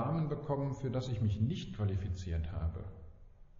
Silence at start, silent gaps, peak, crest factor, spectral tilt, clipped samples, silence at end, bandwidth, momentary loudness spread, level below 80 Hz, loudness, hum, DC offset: 0 s; none; -22 dBFS; 16 dB; -8 dB/octave; under 0.1%; 0 s; 7.4 kHz; 7 LU; -48 dBFS; -37 LUFS; none; under 0.1%